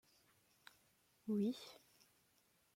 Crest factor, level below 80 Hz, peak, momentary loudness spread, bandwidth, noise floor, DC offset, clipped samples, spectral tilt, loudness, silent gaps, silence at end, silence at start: 18 dB; under -90 dBFS; -30 dBFS; 25 LU; 16.5 kHz; -77 dBFS; under 0.1%; under 0.1%; -6.5 dB/octave; -43 LUFS; none; 1 s; 1.25 s